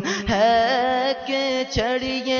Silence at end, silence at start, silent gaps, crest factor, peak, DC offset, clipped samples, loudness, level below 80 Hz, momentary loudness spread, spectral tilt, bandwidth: 0 s; 0 s; none; 16 dB; -6 dBFS; under 0.1%; under 0.1%; -21 LUFS; -44 dBFS; 6 LU; -4 dB/octave; 7.2 kHz